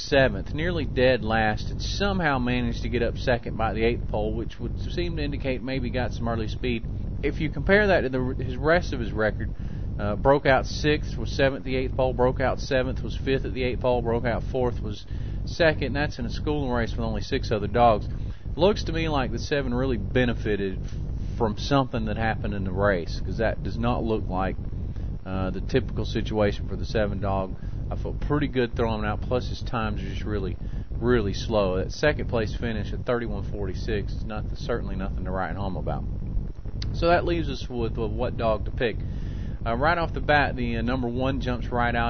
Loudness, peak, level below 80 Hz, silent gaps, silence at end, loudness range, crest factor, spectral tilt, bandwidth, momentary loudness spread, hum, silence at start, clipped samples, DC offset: -26 LUFS; -6 dBFS; -32 dBFS; none; 0 s; 4 LU; 20 dB; -6.5 dB/octave; 6.6 kHz; 10 LU; none; 0 s; under 0.1%; 1%